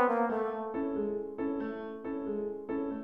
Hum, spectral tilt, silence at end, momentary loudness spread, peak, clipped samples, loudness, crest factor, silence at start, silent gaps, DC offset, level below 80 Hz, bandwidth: none; -8.5 dB/octave; 0 s; 8 LU; -14 dBFS; under 0.1%; -35 LUFS; 18 dB; 0 s; none; under 0.1%; -66 dBFS; 5.2 kHz